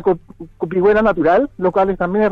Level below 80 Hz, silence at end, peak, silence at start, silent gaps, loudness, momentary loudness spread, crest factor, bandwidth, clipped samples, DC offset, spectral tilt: -40 dBFS; 0 s; -4 dBFS; 0 s; none; -16 LUFS; 9 LU; 10 dB; 6 kHz; under 0.1%; under 0.1%; -9 dB/octave